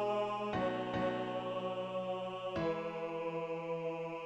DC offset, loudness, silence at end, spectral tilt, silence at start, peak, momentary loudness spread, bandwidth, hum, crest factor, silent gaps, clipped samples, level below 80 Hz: under 0.1%; -38 LUFS; 0 s; -6.5 dB/octave; 0 s; -24 dBFS; 4 LU; 8.6 kHz; none; 14 dB; none; under 0.1%; -66 dBFS